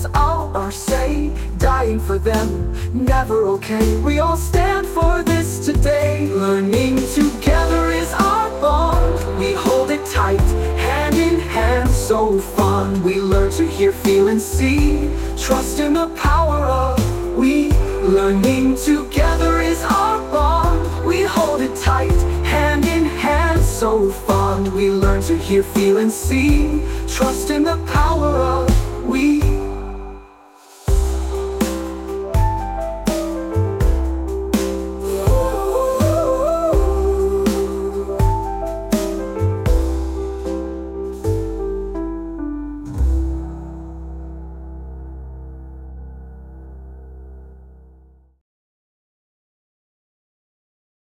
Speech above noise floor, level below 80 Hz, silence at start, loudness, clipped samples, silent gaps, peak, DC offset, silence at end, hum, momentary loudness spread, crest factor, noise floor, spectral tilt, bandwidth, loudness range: 33 dB; -24 dBFS; 0 s; -18 LUFS; under 0.1%; none; -2 dBFS; under 0.1%; 3.4 s; none; 11 LU; 14 dB; -49 dBFS; -6 dB/octave; 17 kHz; 8 LU